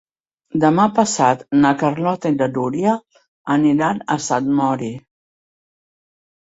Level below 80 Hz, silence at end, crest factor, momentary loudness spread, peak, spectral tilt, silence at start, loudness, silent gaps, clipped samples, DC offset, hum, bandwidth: -58 dBFS; 1.45 s; 16 dB; 10 LU; -2 dBFS; -5.5 dB/octave; 0.55 s; -18 LUFS; 3.28-3.45 s; under 0.1%; under 0.1%; none; 8 kHz